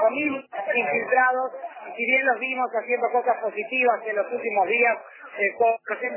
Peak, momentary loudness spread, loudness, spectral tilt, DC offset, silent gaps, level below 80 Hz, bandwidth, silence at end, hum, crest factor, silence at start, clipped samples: -8 dBFS; 9 LU; -23 LUFS; -7 dB/octave; under 0.1%; none; -82 dBFS; 3.2 kHz; 0 s; none; 16 dB; 0 s; under 0.1%